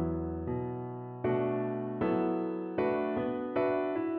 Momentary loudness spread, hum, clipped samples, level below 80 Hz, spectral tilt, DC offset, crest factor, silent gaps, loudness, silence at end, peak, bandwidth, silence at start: 6 LU; none; under 0.1%; -54 dBFS; -7.5 dB/octave; under 0.1%; 14 dB; none; -33 LUFS; 0 s; -18 dBFS; 4.8 kHz; 0 s